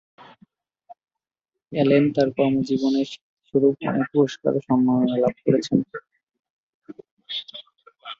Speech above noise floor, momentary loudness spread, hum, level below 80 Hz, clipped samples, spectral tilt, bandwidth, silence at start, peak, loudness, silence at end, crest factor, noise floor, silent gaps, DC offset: 66 dB; 15 LU; none; -62 dBFS; under 0.1%; -7 dB/octave; 7.4 kHz; 0.2 s; -4 dBFS; -22 LUFS; 0.05 s; 20 dB; -86 dBFS; 3.21-3.37 s, 6.23-6.27 s, 6.50-6.82 s, 7.11-7.17 s; under 0.1%